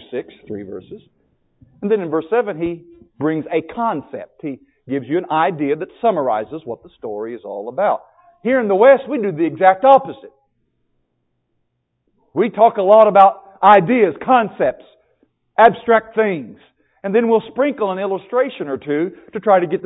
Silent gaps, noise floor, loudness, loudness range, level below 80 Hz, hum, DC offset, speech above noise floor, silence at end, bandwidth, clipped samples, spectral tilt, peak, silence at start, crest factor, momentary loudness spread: none; -70 dBFS; -16 LUFS; 9 LU; -60 dBFS; none; under 0.1%; 54 dB; 0 s; 4 kHz; under 0.1%; -9 dB/octave; 0 dBFS; 0.1 s; 18 dB; 19 LU